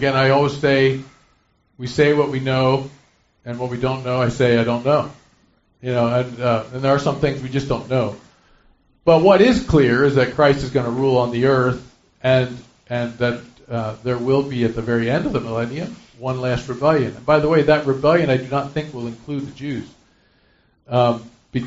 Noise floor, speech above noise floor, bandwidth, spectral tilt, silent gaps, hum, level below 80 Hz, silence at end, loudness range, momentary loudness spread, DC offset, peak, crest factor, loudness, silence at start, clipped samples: -61 dBFS; 43 dB; 8 kHz; -5.5 dB/octave; none; none; -44 dBFS; 0 s; 6 LU; 13 LU; under 0.1%; 0 dBFS; 18 dB; -19 LUFS; 0 s; under 0.1%